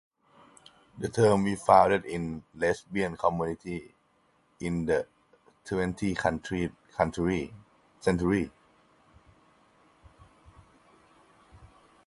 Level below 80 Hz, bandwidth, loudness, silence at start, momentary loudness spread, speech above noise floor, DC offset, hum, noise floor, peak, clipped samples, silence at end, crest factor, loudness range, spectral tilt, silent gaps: -52 dBFS; 11.5 kHz; -28 LUFS; 0.95 s; 15 LU; 40 dB; under 0.1%; none; -68 dBFS; -6 dBFS; under 0.1%; 0.4 s; 24 dB; 8 LU; -6.5 dB/octave; none